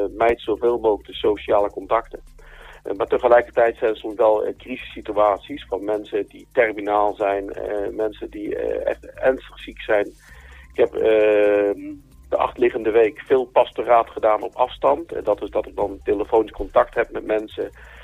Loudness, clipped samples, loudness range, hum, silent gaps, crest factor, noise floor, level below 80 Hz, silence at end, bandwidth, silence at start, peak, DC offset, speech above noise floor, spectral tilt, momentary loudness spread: -21 LUFS; under 0.1%; 4 LU; none; none; 18 dB; -43 dBFS; -46 dBFS; 0 s; 11.5 kHz; 0 s; -4 dBFS; under 0.1%; 22 dB; -6 dB/octave; 12 LU